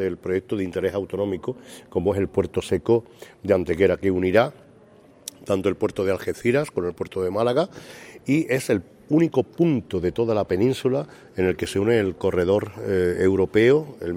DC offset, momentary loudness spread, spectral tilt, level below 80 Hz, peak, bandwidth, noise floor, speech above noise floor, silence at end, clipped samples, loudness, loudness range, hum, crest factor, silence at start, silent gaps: under 0.1%; 9 LU; -6.5 dB/octave; -52 dBFS; -4 dBFS; 16 kHz; -51 dBFS; 29 dB; 0 s; under 0.1%; -23 LUFS; 3 LU; none; 18 dB; 0 s; none